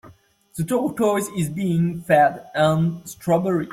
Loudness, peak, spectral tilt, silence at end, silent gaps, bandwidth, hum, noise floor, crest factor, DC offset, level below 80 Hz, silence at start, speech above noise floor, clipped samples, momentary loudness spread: -21 LUFS; -4 dBFS; -6.5 dB/octave; 0 s; none; 15.5 kHz; none; -51 dBFS; 16 dB; under 0.1%; -56 dBFS; 0.05 s; 30 dB; under 0.1%; 8 LU